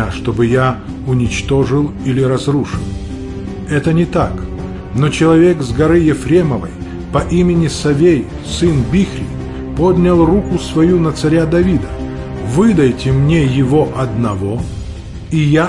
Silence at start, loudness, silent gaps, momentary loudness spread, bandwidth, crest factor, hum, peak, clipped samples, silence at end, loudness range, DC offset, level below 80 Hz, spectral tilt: 0 s; -14 LUFS; none; 13 LU; 11.5 kHz; 12 dB; none; 0 dBFS; under 0.1%; 0 s; 3 LU; under 0.1%; -28 dBFS; -7 dB/octave